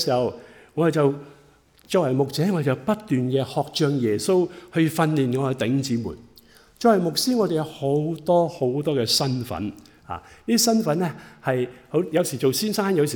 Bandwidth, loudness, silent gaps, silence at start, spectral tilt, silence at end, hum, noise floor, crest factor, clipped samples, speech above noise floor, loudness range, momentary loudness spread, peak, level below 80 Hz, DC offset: over 20 kHz; -23 LUFS; none; 0 s; -5 dB/octave; 0 s; none; -55 dBFS; 18 dB; under 0.1%; 33 dB; 2 LU; 10 LU; -6 dBFS; -60 dBFS; under 0.1%